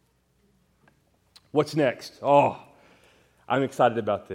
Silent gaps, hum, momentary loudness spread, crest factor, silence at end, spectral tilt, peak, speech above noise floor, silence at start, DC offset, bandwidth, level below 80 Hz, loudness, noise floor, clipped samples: none; none; 8 LU; 22 dB; 0 s; -6.5 dB/octave; -6 dBFS; 43 dB; 1.55 s; under 0.1%; 16 kHz; -70 dBFS; -24 LUFS; -67 dBFS; under 0.1%